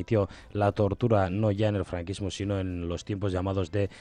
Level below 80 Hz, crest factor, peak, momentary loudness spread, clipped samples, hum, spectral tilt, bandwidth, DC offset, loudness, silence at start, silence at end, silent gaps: -52 dBFS; 16 dB; -12 dBFS; 8 LU; under 0.1%; none; -7.5 dB/octave; 10 kHz; under 0.1%; -29 LUFS; 0 s; 0 s; none